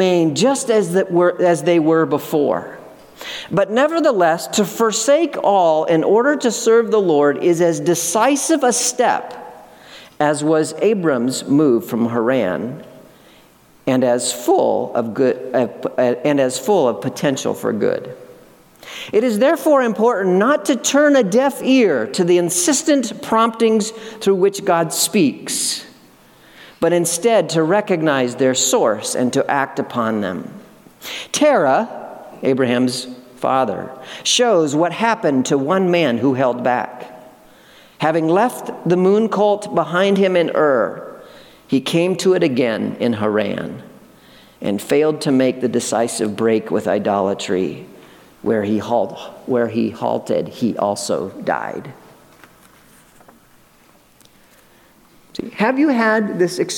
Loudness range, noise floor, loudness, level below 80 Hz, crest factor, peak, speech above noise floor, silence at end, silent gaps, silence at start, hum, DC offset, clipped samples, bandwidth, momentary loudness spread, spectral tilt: 5 LU; -51 dBFS; -17 LUFS; -64 dBFS; 16 dB; -2 dBFS; 35 dB; 0 s; none; 0 s; none; under 0.1%; under 0.1%; 18 kHz; 10 LU; -4 dB/octave